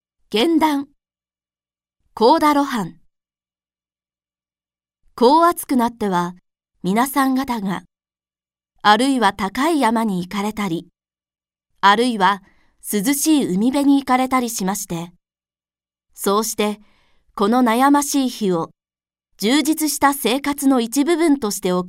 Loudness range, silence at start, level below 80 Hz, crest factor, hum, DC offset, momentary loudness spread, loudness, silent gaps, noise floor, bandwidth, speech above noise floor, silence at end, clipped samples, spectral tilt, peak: 4 LU; 0.3 s; -56 dBFS; 20 dB; none; under 0.1%; 11 LU; -18 LUFS; none; under -90 dBFS; 16 kHz; over 73 dB; 0 s; under 0.1%; -4 dB/octave; 0 dBFS